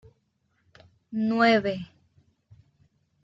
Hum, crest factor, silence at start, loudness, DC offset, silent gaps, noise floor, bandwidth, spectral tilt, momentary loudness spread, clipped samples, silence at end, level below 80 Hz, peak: none; 22 dB; 1.1 s; -24 LUFS; under 0.1%; none; -72 dBFS; 7.6 kHz; -6.5 dB/octave; 16 LU; under 0.1%; 1.4 s; -68 dBFS; -8 dBFS